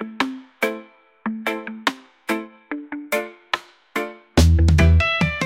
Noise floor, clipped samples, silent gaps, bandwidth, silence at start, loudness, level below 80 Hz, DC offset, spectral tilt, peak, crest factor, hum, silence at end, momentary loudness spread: -42 dBFS; under 0.1%; none; 16 kHz; 0 s; -21 LUFS; -30 dBFS; under 0.1%; -5.5 dB/octave; -4 dBFS; 16 dB; none; 0 s; 16 LU